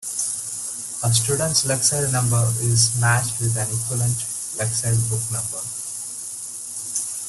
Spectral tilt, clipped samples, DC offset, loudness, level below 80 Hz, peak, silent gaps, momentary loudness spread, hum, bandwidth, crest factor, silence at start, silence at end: -3 dB/octave; under 0.1%; under 0.1%; -21 LUFS; -50 dBFS; -4 dBFS; none; 11 LU; none; 12.5 kHz; 18 dB; 0 s; 0 s